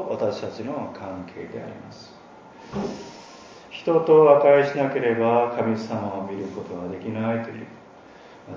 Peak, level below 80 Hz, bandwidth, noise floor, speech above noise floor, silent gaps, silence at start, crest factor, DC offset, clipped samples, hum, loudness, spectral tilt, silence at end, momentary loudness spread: -2 dBFS; -60 dBFS; 7.4 kHz; -47 dBFS; 24 dB; none; 0 s; 22 dB; under 0.1%; under 0.1%; none; -22 LUFS; -7 dB/octave; 0 s; 24 LU